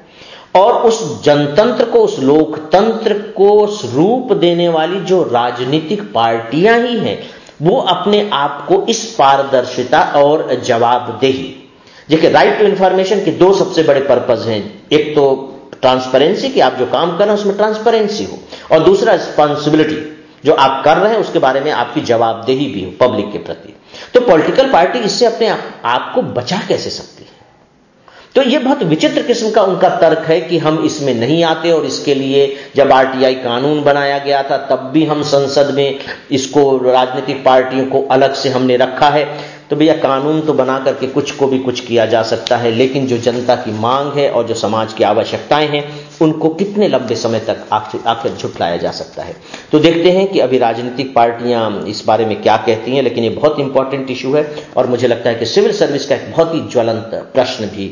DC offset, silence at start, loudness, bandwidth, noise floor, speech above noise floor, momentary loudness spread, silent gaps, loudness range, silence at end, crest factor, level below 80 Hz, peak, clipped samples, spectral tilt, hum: under 0.1%; 0.2 s; -13 LUFS; 7.4 kHz; -48 dBFS; 36 dB; 7 LU; none; 3 LU; 0 s; 12 dB; -52 dBFS; 0 dBFS; under 0.1%; -5 dB/octave; none